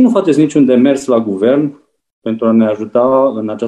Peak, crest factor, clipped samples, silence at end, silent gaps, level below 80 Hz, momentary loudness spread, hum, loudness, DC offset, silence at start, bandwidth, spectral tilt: 0 dBFS; 12 dB; under 0.1%; 0 s; 2.13-2.22 s; -60 dBFS; 7 LU; none; -12 LUFS; under 0.1%; 0 s; 10.5 kHz; -7 dB/octave